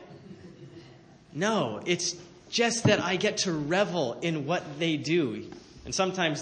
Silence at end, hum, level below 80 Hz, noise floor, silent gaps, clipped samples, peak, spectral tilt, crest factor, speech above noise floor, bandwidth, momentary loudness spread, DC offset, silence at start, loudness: 0 s; none; -62 dBFS; -53 dBFS; none; under 0.1%; -8 dBFS; -4 dB/octave; 22 dB; 25 dB; 9.8 kHz; 23 LU; under 0.1%; 0 s; -28 LUFS